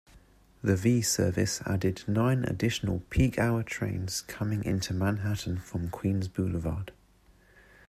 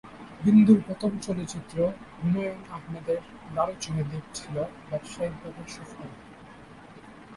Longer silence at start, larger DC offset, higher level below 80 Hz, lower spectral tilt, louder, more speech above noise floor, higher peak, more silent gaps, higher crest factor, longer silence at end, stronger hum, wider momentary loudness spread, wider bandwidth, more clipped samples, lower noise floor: about the same, 0.15 s vs 0.05 s; neither; first, -48 dBFS vs -56 dBFS; second, -5.5 dB/octave vs -7 dB/octave; second, -30 LUFS vs -27 LUFS; first, 32 dB vs 21 dB; second, -12 dBFS vs -6 dBFS; neither; about the same, 18 dB vs 20 dB; first, 0.95 s vs 0 s; neither; second, 8 LU vs 27 LU; first, 15 kHz vs 11.5 kHz; neither; first, -61 dBFS vs -48 dBFS